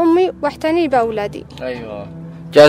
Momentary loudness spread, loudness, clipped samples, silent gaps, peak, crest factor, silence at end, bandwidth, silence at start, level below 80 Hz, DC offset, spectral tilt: 15 LU; -18 LUFS; 0.3%; none; 0 dBFS; 16 dB; 0 s; 13.5 kHz; 0 s; -46 dBFS; under 0.1%; -5.5 dB/octave